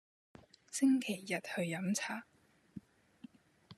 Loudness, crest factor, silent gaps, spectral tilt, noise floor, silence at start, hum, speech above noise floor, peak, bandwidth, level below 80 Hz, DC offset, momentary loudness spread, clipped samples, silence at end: -36 LUFS; 18 dB; none; -4.5 dB/octave; -62 dBFS; 0.7 s; none; 27 dB; -22 dBFS; 13.5 kHz; -82 dBFS; under 0.1%; 24 LU; under 0.1%; 0.05 s